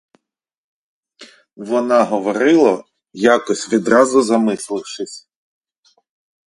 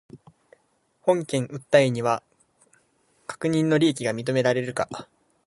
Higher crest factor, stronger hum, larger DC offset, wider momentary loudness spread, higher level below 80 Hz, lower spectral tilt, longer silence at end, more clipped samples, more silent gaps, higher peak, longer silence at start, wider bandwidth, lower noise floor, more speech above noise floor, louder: about the same, 18 dB vs 22 dB; neither; neither; first, 16 LU vs 11 LU; about the same, -64 dBFS vs -66 dBFS; about the same, -4.5 dB/octave vs -5.5 dB/octave; first, 1.25 s vs 0.45 s; neither; neither; first, 0 dBFS vs -4 dBFS; first, 1.2 s vs 0.15 s; about the same, 11.5 kHz vs 11.5 kHz; about the same, -68 dBFS vs -68 dBFS; first, 52 dB vs 45 dB; first, -16 LUFS vs -24 LUFS